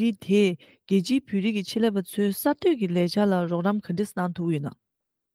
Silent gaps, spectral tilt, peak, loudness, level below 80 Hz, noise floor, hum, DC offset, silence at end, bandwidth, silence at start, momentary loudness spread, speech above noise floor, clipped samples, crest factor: none; -6.5 dB/octave; -12 dBFS; -25 LUFS; -68 dBFS; -80 dBFS; none; under 0.1%; 0.6 s; 16 kHz; 0 s; 6 LU; 55 dB; under 0.1%; 14 dB